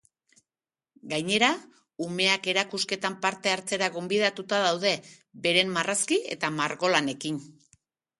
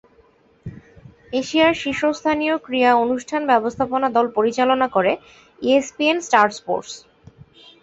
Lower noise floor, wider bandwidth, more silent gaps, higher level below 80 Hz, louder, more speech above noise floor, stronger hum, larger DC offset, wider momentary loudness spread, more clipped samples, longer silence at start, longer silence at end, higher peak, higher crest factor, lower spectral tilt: first, under -90 dBFS vs -55 dBFS; first, 12 kHz vs 8.2 kHz; neither; second, -74 dBFS vs -56 dBFS; second, -26 LUFS vs -19 LUFS; first, over 63 dB vs 36 dB; neither; neither; about the same, 10 LU vs 11 LU; neither; first, 1.05 s vs 0.65 s; second, 0.7 s vs 0.85 s; about the same, -4 dBFS vs -2 dBFS; about the same, 24 dB vs 20 dB; second, -2.5 dB/octave vs -4 dB/octave